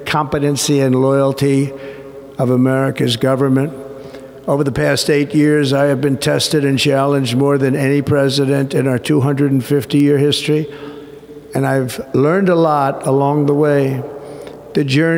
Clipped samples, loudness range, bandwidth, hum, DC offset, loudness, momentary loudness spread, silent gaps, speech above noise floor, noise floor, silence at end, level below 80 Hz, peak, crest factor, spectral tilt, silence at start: under 0.1%; 2 LU; 16.5 kHz; none; under 0.1%; -15 LUFS; 17 LU; none; 21 dB; -35 dBFS; 0 s; -50 dBFS; -2 dBFS; 14 dB; -6 dB/octave; 0 s